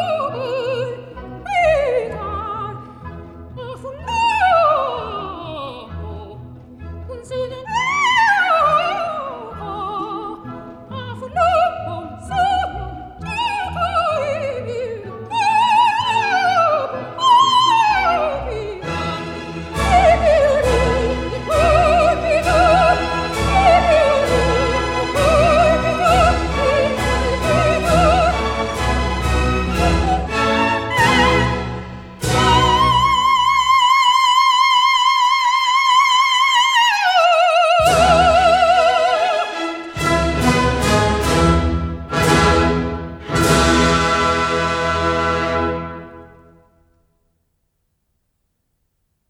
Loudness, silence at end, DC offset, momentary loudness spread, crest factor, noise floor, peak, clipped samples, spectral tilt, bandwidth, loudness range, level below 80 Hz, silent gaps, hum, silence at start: -16 LUFS; 3.05 s; under 0.1%; 16 LU; 14 dB; -69 dBFS; -2 dBFS; under 0.1%; -4.5 dB/octave; 16 kHz; 9 LU; -30 dBFS; none; none; 0 s